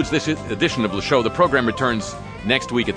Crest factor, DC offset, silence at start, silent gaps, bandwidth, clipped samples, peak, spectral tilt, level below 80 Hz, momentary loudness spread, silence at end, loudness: 18 dB; under 0.1%; 0 s; none; 10 kHz; under 0.1%; -2 dBFS; -5 dB/octave; -42 dBFS; 8 LU; 0 s; -20 LUFS